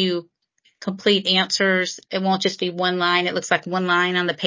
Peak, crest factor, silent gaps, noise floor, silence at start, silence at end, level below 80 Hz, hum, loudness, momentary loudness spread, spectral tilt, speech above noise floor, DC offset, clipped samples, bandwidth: -4 dBFS; 18 dB; none; -61 dBFS; 0 s; 0 s; -72 dBFS; none; -20 LUFS; 7 LU; -4 dB/octave; 40 dB; under 0.1%; under 0.1%; 7.6 kHz